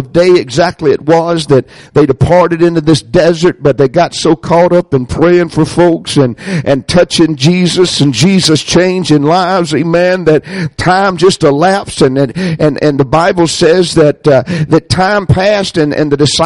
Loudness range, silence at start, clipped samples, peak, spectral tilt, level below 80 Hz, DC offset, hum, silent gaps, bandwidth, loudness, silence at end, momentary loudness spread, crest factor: 1 LU; 0 s; under 0.1%; 0 dBFS; -5.5 dB/octave; -36 dBFS; under 0.1%; none; none; 11.5 kHz; -9 LUFS; 0 s; 4 LU; 8 dB